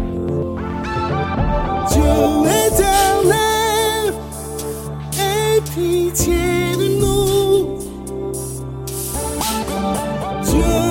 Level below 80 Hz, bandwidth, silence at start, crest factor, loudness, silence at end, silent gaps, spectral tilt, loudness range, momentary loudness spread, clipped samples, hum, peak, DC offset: -28 dBFS; 17 kHz; 0 s; 16 dB; -18 LUFS; 0 s; none; -4.5 dB/octave; 5 LU; 12 LU; under 0.1%; none; -2 dBFS; under 0.1%